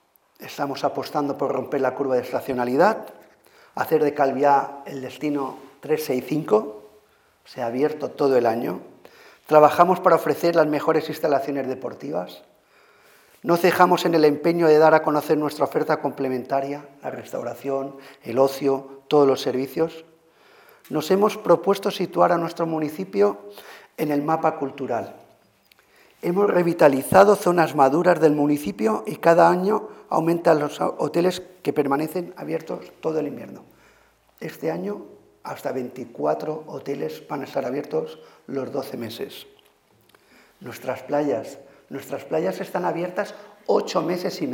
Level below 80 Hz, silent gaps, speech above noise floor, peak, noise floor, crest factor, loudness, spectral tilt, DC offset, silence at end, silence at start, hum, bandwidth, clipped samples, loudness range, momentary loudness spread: -66 dBFS; none; 37 dB; -2 dBFS; -59 dBFS; 22 dB; -22 LUFS; -6 dB/octave; under 0.1%; 0 s; 0.4 s; none; 18.5 kHz; under 0.1%; 11 LU; 16 LU